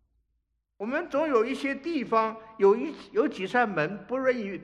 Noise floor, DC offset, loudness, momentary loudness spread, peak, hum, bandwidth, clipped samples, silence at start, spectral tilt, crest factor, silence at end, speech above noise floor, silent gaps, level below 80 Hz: -77 dBFS; under 0.1%; -27 LUFS; 8 LU; -10 dBFS; none; 10.5 kHz; under 0.1%; 0.8 s; -6 dB/octave; 18 dB; 0 s; 50 dB; none; -68 dBFS